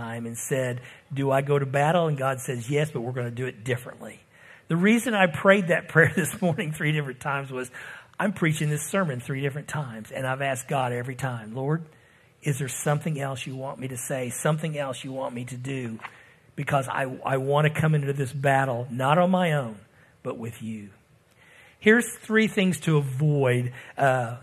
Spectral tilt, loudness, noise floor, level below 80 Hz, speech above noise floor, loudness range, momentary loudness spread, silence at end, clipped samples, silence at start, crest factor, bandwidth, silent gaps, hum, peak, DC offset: -5.5 dB/octave; -25 LUFS; -58 dBFS; -66 dBFS; 33 dB; 7 LU; 14 LU; 0 s; under 0.1%; 0 s; 22 dB; 14 kHz; none; none; -4 dBFS; under 0.1%